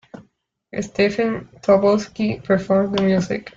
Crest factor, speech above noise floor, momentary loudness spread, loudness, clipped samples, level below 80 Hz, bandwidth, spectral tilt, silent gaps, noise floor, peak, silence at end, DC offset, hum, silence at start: 16 dB; 43 dB; 10 LU; -19 LUFS; under 0.1%; -52 dBFS; 7.6 kHz; -6.5 dB/octave; none; -62 dBFS; -4 dBFS; 0.1 s; under 0.1%; none; 0.15 s